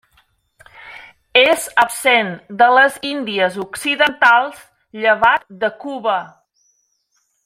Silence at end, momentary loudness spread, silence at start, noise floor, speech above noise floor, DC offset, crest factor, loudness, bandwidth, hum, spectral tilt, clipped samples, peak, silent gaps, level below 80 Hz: 1.2 s; 11 LU; 0.85 s; -66 dBFS; 50 dB; under 0.1%; 18 dB; -15 LUFS; 16 kHz; none; -2.5 dB/octave; under 0.1%; 0 dBFS; none; -58 dBFS